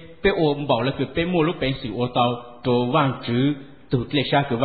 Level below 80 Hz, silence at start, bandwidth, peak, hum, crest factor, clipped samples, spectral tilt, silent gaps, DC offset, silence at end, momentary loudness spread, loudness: -46 dBFS; 0 s; 4.8 kHz; -6 dBFS; none; 16 dB; under 0.1%; -11.5 dB/octave; none; 0.4%; 0 s; 6 LU; -22 LUFS